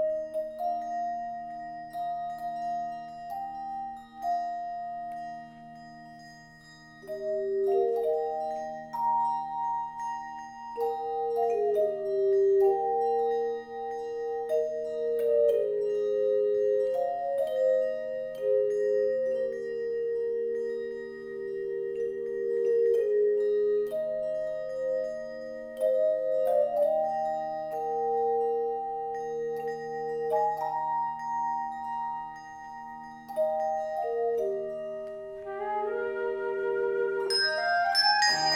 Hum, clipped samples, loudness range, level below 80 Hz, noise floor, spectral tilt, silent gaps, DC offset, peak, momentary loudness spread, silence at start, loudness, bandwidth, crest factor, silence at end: none; under 0.1%; 8 LU; -68 dBFS; -51 dBFS; -3 dB/octave; none; under 0.1%; -12 dBFS; 13 LU; 0 s; -29 LUFS; 15 kHz; 16 dB; 0 s